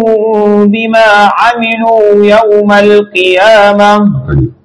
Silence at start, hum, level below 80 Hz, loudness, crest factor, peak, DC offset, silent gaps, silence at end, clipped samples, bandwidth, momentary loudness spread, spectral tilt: 0 s; none; -32 dBFS; -6 LUFS; 6 dB; 0 dBFS; under 0.1%; none; 0.1 s; 9%; 12 kHz; 4 LU; -6 dB/octave